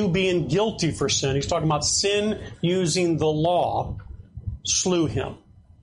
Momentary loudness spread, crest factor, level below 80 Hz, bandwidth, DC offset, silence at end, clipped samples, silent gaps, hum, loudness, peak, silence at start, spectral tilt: 13 LU; 14 dB; -44 dBFS; 11.5 kHz; under 0.1%; 0.45 s; under 0.1%; none; none; -23 LUFS; -10 dBFS; 0 s; -4 dB/octave